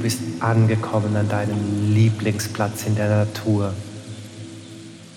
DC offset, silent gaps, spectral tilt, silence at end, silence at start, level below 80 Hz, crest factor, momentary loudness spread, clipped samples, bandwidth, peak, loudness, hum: under 0.1%; none; -6.5 dB/octave; 0 s; 0 s; -62 dBFS; 16 dB; 19 LU; under 0.1%; 15 kHz; -6 dBFS; -21 LUFS; none